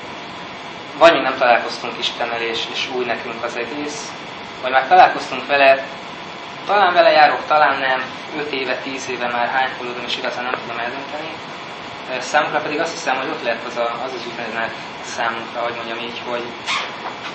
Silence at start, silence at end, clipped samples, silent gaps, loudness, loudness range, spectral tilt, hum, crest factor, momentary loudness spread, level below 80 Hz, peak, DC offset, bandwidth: 0 s; 0 s; under 0.1%; none; -18 LUFS; 8 LU; -3 dB/octave; none; 20 dB; 17 LU; -60 dBFS; 0 dBFS; under 0.1%; 8.6 kHz